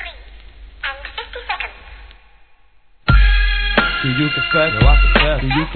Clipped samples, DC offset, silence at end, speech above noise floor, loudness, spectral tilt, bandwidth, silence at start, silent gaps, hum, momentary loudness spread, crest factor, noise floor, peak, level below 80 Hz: under 0.1%; 0.3%; 0 s; 39 dB; -16 LUFS; -8.5 dB/octave; 4.5 kHz; 0 s; none; none; 15 LU; 16 dB; -53 dBFS; 0 dBFS; -20 dBFS